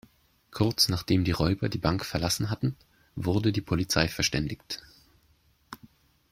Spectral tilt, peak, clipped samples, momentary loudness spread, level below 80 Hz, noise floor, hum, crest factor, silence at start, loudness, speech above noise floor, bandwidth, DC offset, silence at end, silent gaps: -4.5 dB/octave; -4 dBFS; under 0.1%; 21 LU; -48 dBFS; -65 dBFS; none; 24 dB; 0.5 s; -27 LUFS; 38 dB; 16.5 kHz; under 0.1%; 0.55 s; none